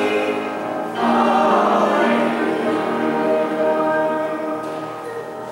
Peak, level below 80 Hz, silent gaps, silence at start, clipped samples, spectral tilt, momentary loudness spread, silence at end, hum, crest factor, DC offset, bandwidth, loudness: -4 dBFS; -66 dBFS; none; 0 s; under 0.1%; -5.5 dB/octave; 12 LU; 0 s; none; 14 dB; under 0.1%; 16 kHz; -19 LUFS